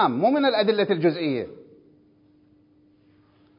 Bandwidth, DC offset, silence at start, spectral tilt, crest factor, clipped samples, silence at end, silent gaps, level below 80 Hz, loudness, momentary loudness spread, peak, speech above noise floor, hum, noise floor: 5.4 kHz; under 0.1%; 0 s; -10.5 dB/octave; 18 dB; under 0.1%; 2 s; none; -70 dBFS; -22 LUFS; 9 LU; -8 dBFS; 37 dB; none; -59 dBFS